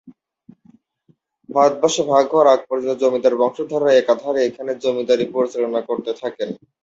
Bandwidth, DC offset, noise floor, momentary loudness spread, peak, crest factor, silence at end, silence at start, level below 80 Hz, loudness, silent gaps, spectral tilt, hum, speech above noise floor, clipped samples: 7.8 kHz; under 0.1%; -60 dBFS; 10 LU; -2 dBFS; 18 dB; 0.25 s; 0.05 s; -66 dBFS; -18 LUFS; none; -4 dB/octave; none; 43 dB; under 0.1%